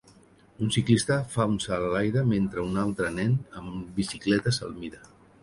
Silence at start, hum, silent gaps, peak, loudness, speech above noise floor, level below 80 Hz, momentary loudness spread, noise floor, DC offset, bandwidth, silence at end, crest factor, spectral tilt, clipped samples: 0.6 s; none; none; -8 dBFS; -27 LUFS; 30 dB; -52 dBFS; 12 LU; -56 dBFS; under 0.1%; 11.5 kHz; 0.45 s; 20 dB; -5.5 dB/octave; under 0.1%